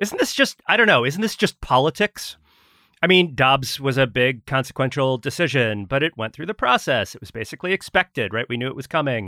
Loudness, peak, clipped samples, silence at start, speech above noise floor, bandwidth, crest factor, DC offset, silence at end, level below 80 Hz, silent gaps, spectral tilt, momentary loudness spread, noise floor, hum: -20 LUFS; -2 dBFS; under 0.1%; 0 s; 37 dB; 16.5 kHz; 18 dB; under 0.1%; 0 s; -50 dBFS; none; -4.5 dB/octave; 10 LU; -58 dBFS; none